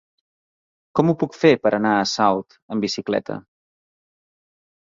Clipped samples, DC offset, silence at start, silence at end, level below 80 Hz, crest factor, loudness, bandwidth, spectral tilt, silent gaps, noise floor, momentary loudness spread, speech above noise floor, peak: under 0.1%; under 0.1%; 0.95 s; 1.45 s; -62 dBFS; 20 dB; -20 LUFS; 7.6 kHz; -5.5 dB/octave; 2.62-2.69 s; under -90 dBFS; 11 LU; over 70 dB; -2 dBFS